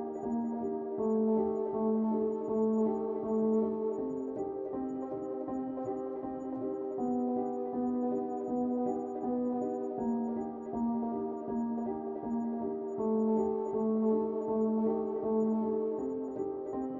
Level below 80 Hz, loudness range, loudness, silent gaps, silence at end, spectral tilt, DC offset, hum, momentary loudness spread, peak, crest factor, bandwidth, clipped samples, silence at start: -68 dBFS; 4 LU; -33 LUFS; none; 0 s; -11 dB/octave; under 0.1%; none; 7 LU; -20 dBFS; 12 dB; 7.2 kHz; under 0.1%; 0 s